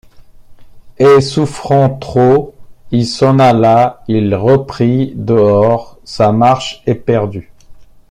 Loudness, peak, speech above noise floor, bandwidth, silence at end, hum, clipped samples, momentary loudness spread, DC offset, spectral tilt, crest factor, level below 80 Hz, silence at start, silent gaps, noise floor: -12 LUFS; 0 dBFS; 25 dB; 11.5 kHz; 0.25 s; none; under 0.1%; 9 LU; under 0.1%; -7 dB/octave; 12 dB; -42 dBFS; 0.2 s; none; -36 dBFS